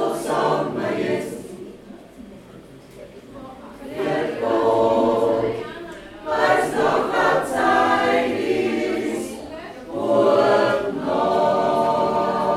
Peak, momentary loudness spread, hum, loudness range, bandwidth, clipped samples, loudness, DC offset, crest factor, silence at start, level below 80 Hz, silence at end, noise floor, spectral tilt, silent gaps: -4 dBFS; 21 LU; none; 10 LU; 15 kHz; under 0.1%; -20 LUFS; under 0.1%; 16 dB; 0 s; -54 dBFS; 0 s; -43 dBFS; -5 dB/octave; none